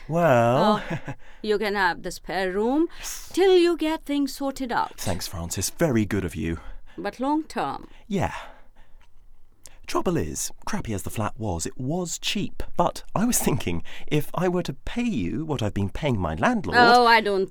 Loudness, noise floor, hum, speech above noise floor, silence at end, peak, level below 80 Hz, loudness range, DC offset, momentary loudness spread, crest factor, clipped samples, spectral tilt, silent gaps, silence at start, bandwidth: -24 LUFS; -43 dBFS; none; 20 dB; 0 s; -4 dBFS; -42 dBFS; 7 LU; under 0.1%; 13 LU; 20 dB; under 0.1%; -4.5 dB/octave; none; 0 s; 20 kHz